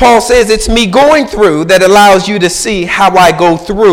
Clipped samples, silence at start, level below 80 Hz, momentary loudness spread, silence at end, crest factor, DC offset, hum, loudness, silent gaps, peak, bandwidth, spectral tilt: 0.9%; 0 s; -26 dBFS; 6 LU; 0 s; 6 dB; under 0.1%; none; -7 LUFS; none; 0 dBFS; 17 kHz; -4 dB/octave